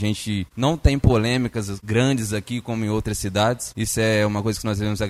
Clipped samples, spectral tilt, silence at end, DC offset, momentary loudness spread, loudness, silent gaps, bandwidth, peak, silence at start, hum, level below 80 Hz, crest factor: under 0.1%; -5.5 dB/octave; 0 s; under 0.1%; 7 LU; -22 LUFS; none; 15 kHz; -2 dBFS; 0 s; none; -34 dBFS; 18 dB